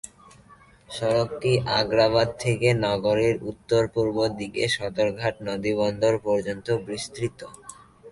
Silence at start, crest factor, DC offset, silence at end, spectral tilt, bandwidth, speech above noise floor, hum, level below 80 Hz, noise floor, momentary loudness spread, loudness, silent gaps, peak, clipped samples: 0.05 s; 18 dB; under 0.1%; 0 s; -5.5 dB/octave; 11.5 kHz; 29 dB; none; -52 dBFS; -53 dBFS; 10 LU; -24 LUFS; none; -8 dBFS; under 0.1%